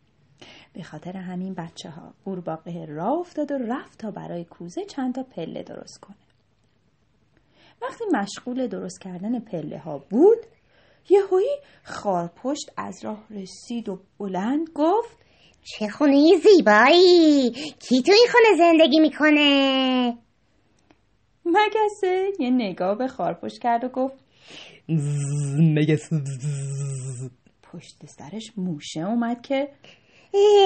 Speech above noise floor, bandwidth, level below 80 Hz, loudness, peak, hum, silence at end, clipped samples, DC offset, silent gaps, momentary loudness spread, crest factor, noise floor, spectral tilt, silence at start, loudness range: 44 dB; 8.8 kHz; -68 dBFS; -21 LUFS; -2 dBFS; none; 0 s; under 0.1%; under 0.1%; none; 21 LU; 20 dB; -65 dBFS; -5.5 dB/octave; 0.4 s; 16 LU